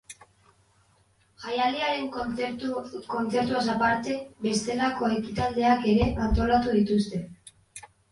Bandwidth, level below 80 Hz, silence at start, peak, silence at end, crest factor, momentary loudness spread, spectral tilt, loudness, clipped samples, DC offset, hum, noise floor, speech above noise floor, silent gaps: 11.5 kHz; -42 dBFS; 0.1 s; -10 dBFS; 0.3 s; 18 dB; 15 LU; -5.5 dB/octave; -26 LUFS; under 0.1%; under 0.1%; none; -64 dBFS; 38 dB; none